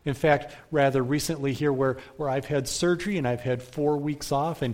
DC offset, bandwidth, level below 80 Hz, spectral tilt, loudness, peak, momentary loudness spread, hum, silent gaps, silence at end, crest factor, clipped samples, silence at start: under 0.1%; 16.5 kHz; -52 dBFS; -5.5 dB/octave; -26 LUFS; -6 dBFS; 6 LU; none; none; 0 s; 20 dB; under 0.1%; 0.05 s